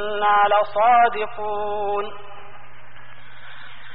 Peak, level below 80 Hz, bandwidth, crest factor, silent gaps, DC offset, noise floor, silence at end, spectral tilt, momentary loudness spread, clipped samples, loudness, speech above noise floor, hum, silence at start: -6 dBFS; -58 dBFS; 4.9 kHz; 16 dB; none; 4%; -46 dBFS; 0 s; -0.5 dB/octave; 25 LU; under 0.1%; -19 LUFS; 26 dB; none; 0 s